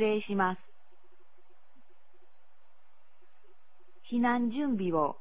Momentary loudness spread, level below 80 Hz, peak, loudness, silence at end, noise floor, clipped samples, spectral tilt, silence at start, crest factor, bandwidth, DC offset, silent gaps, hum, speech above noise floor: 5 LU; -68 dBFS; -14 dBFS; -31 LUFS; 0.1 s; -71 dBFS; under 0.1%; -5 dB/octave; 0 s; 20 dB; 4 kHz; 0.8%; none; 50 Hz at -80 dBFS; 41 dB